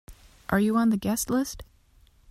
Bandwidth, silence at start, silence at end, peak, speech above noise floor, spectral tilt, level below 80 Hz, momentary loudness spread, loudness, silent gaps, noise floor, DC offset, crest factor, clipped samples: 16 kHz; 0.1 s; 0.7 s; -6 dBFS; 34 dB; -5 dB/octave; -50 dBFS; 17 LU; -26 LUFS; none; -59 dBFS; under 0.1%; 20 dB; under 0.1%